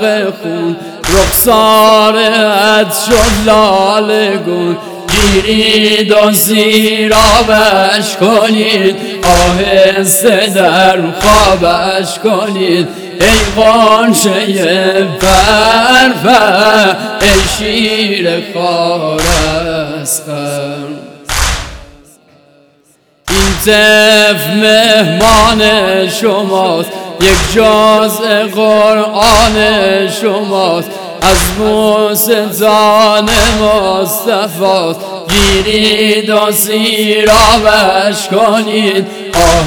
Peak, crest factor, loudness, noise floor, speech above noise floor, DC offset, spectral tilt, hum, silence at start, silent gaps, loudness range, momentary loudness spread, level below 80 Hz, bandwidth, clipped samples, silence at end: 0 dBFS; 8 dB; -8 LUFS; -50 dBFS; 42 dB; under 0.1%; -3 dB/octave; none; 0 s; none; 4 LU; 8 LU; -24 dBFS; over 20 kHz; 1%; 0 s